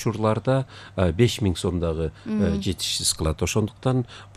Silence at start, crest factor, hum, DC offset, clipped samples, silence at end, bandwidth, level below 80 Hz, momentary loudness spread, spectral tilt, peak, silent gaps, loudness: 0 s; 18 dB; none; under 0.1%; under 0.1%; 0.1 s; 14.5 kHz; -40 dBFS; 6 LU; -5 dB/octave; -6 dBFS; none; -24 LUFS